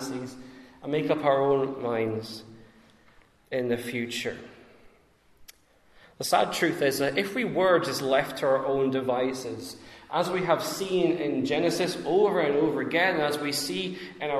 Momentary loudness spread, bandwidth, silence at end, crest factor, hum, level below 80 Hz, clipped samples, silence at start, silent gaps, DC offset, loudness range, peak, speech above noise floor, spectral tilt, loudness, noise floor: 12 LU; 14 kHz; 0 s; 20 dB; none; -66 dBFS; under 0.1%; 0 s; none; under 0.1%; 9 LU; -8 dBFS; 35 dB; -4.5 dB/octave; -27 LUFS; -61 dBFS